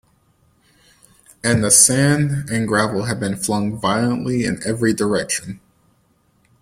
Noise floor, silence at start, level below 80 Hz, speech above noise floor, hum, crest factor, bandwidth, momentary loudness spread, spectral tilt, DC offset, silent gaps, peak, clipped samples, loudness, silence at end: -60 dBFS; 1.45 s; -50 dBFS; 42 dB; none; 20 dB; 16.5 kHz; 12 LU; -4 dB/octave; under 0.1%; none; 0 dBFS; under 0.1%; -17 LUFS; 1.05 s